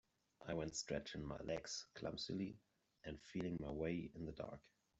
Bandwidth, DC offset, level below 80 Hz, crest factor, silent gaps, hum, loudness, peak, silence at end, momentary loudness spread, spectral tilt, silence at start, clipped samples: 8.2 kHz; under 0.1%; -66 dBFS; 18 dB; none; none; -48 LUFS; -30 dBFS; 0.35 s; 10 LU; -4.5 dB/octave; 0.4 s; under 0.1%